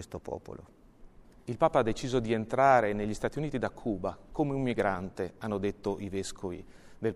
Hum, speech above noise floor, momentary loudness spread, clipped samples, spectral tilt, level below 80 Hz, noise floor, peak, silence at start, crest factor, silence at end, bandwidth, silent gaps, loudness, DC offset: none; 23 dB; 15 LU; under 0.1%; -6 dB/octave; -50 dBFS; -53 dBFS; -10 dBFS; 0 s; 22 dB; 0 s; 12.5 kHz; none; -31 LUFS; under 0.1%